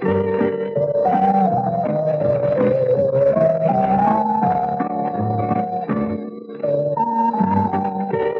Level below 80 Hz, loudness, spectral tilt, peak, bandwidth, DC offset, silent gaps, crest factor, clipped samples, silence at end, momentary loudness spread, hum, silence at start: -52 dBFS; -19 LUFS; -10.5 dB/octave; -4 dBFS; 6 kHz; under 0.1%; none; 14 dB; under 0.1%; 0 s; 6 LU; none; 0 s